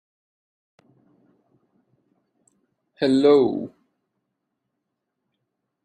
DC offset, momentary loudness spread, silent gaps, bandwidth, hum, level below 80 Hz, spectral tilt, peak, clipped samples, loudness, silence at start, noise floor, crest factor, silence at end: under 0.1%; 16 LU; none; 9.4 kHz; none; -70 dBFS; -6.5 dB/octave; -6 dBFS; under 0.1%; -19 LUFS; 3 s; -80 dBFS; 20 dB; 2.15 s